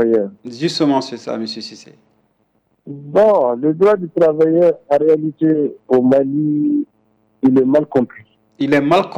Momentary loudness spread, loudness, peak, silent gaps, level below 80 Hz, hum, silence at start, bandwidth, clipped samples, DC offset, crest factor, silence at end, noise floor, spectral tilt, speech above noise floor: 13 LU; -16 LUFS; -4 dBFS; none; -58 dBFS; none; 0 s; 9.4 kHz; under 0.1%; under 0.1%; 12 dB; 0 s; -63 dBFS; -7 dB/octave; 48 dB